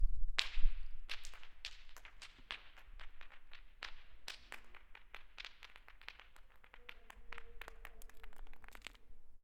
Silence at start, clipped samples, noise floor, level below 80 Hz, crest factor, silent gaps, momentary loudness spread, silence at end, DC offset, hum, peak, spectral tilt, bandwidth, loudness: 0 s; under 0.1%; -58 dBFS; -46 dBFS; 30 dB; none; 17 LU; 0.05 s; under 0.1%; none; -8 dBFS; -2 dB/octave; 9.2 kHz; -49 LUFS